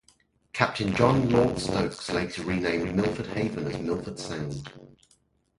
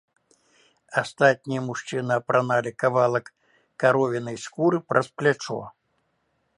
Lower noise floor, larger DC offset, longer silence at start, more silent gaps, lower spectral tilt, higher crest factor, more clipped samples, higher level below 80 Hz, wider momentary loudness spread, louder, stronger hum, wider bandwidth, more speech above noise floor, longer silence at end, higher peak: second, -66 dBFS vs -72 dBFS; neither; second, 0.55 s vs 0.9 s; neither; about the same, -6 dB/octave vs -5.5 dB/octave; about the same, 24 dB vs 22 dB; neither; first, -48 dBFS vs -70 dBFS; first, 12 LU vs 9 LU; second, -27 LUFS vs -24 LUFS; neither; about the same, 11.5 kHz vs 11.5 kHz; second, 40 dB vs 48 dB; second, 0.7 s vs 0.9 s; about the same, -4 dBFS vs -2 dBFS